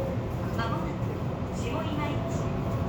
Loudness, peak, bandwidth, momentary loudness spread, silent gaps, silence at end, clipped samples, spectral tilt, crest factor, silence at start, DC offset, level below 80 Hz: -31 LUFS; -16 dBFS; over 20 kHz; 2 LU; none; 0 s; under 0.1%; -7 dB/octave; 14 dB; 0 s; under 0.1%; -42 dBFS